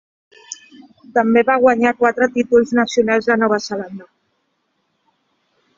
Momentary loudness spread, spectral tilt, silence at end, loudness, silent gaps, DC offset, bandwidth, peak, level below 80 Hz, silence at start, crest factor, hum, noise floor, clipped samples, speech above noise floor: 21 LU; -4.5 dB/octave; 1.75 s; -16 LUFS; none; under 0.1%; 7.6 kHz; 0 dBFS; -58 dBFS; 0.5 s; 18 dB; none; -68 dBFS; under 0.1%; 52 dB